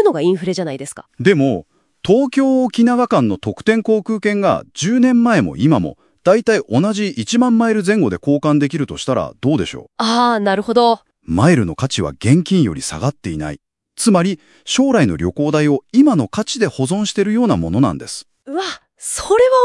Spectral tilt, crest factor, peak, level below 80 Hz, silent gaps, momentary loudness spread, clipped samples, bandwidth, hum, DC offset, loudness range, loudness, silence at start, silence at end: -5.5 dB/octave; 16 dB; 0 dBFS; -48 dBFS; none; 11 LU; under 0.1%; 12 kHz; none; under 0.1%; 2 LU; -16 LUFS; 0 s; 0 s